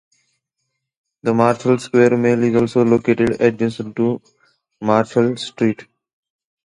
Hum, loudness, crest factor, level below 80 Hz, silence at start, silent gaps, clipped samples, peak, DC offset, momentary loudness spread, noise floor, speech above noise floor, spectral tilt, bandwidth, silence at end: none; -17 LUFS; 18 dB; -54 dBFS; 1.25 s; none; under 0.1%; 0 dBFS; under 0.1%; 8 LU; -76 dBFS; 59 dB; -7 dB/octave; 11 kHz; 0.8 s